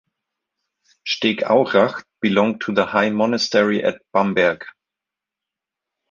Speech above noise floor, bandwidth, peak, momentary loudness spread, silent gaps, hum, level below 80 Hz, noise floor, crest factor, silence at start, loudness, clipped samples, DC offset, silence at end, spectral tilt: 68 dB; 7.4 kHz; -2 dBFS; 7 LU; none; none; -62 dBFS; -86 dBFS; 18 dB; 1.05 s; -19 LUFS; under 0.1%; under 0.1%; 1.4 s; -5 dB/octave